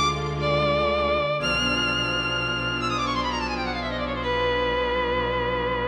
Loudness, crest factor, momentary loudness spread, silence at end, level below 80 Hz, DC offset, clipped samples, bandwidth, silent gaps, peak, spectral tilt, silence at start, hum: -24 LUFS; 14 dB; 5 LU; 0 s; -38 dBFS; under 0.1%; under 0.1%; 12 kHz; none; -12 dBFS; -4.5 dB/octave; 0 s; none